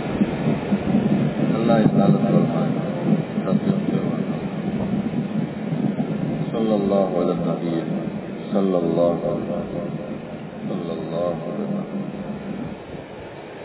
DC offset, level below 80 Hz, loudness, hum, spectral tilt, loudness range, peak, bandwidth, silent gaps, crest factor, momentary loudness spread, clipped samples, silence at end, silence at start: under 0.1%; -50 dBFS; -23 LUFS; none; -12.5 dB/octave; 8 LU; -2 dBFS; 4 kHz; none; 20 dB; 12 LU; under 0.1%; 0 s; 0 s